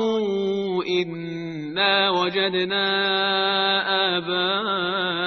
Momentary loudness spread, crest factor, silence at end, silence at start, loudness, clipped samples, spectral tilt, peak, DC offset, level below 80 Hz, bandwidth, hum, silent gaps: 6 LU; 16 dB; 0 s; 0 s; -22 LUFS; under 0.1%; -5 dB/octave; -6 dBFS; under 0.1%; -68 dBFS; 6.4 kHz; none; none